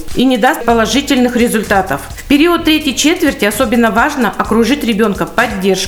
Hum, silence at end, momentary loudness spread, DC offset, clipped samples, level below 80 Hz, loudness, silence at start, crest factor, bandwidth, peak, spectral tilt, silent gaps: none; 0 s; 3 LU; under 0.1%; under 0.1%; -32 dBFS; -12 LUFS; 0 s; 12 dB; over 20 kHz; 0 dBFS; -4 dB/octave; none